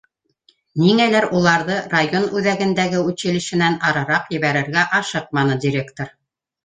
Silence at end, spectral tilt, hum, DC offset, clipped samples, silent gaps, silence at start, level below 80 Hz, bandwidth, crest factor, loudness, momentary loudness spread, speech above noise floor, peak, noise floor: 0.55 s; -5 dB/octave; none; under 0.1%; under 0.1%; none; 0.75 s; -58 dBFS; 9.4 kHz; 18 dB; -18 LUFS; 7 LU; 42 dB; -2 dBFS; -60 dBFS